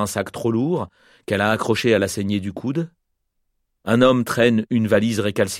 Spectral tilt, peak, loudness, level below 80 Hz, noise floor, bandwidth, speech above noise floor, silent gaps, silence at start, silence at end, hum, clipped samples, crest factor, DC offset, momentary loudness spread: -5.5 dB/octave; -4 dBFS; -20 LUFS; -56 dBFS; -72 dBFS; 16 kHz; 53 dB; none; 0 s; 0 s; none; under 0.1%; 18 dB; under 0.1%; 10 LU